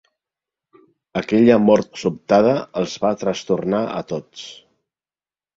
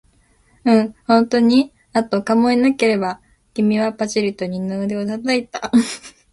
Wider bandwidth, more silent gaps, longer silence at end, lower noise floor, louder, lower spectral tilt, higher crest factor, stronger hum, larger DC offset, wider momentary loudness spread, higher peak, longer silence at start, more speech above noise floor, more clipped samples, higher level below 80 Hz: second, 7.8 kHz vs 11.5 kHz; neither; first, 1.05 s vs 0.25 s; first, under -90 dBFS vs -56 dBFS; about the same, -19 LUFS vs -18 LUFS; about the same, -6.5 dB/octave vs -5.5 dB/octave; about the same, 20 dB vs 16 dB; neither; neither; first, 15 LU vs 10 LU; about the same, 0 dBFS vs -2 dBFS; first, 1.15 s vs 0.65 s; first, over 72 dB vs 39 dB; neither; about the same, -56 dBFS vs -56 dBFS